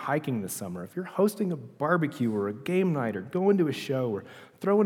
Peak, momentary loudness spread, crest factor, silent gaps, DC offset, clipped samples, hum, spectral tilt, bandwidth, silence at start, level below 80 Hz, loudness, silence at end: -10 dBFS; 9 LU; 18 dB; none; under 0.1%; under 0.1%; none; -6.5 dB/octave; 18 kHz; 0 s; -76 dBFS; -29 LUFS; 0 s